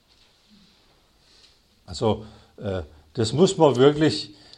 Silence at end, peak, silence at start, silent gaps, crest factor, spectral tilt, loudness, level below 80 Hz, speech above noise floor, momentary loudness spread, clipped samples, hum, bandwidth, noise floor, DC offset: 0.3 s; -2 dBFS; 1.9 s; none; 22 dB; -6 dB/octave; -22 LUFS; -52 dBFS; 39 dB; 17 LU; under 0.1%; none; 11 kHz; -59 dBFS; under 0.1%